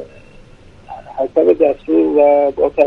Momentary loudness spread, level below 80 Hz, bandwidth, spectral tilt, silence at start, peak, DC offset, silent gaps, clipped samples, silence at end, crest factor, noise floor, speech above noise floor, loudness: 20 LU; -46 dBFS; 5 kHz; -8 dB/octave; 0 s; 0 dBFS; under 0.1%; none; under 0.1%; 0 s; 14 dB; -41 dBFS; 29 dB; -13 LUFS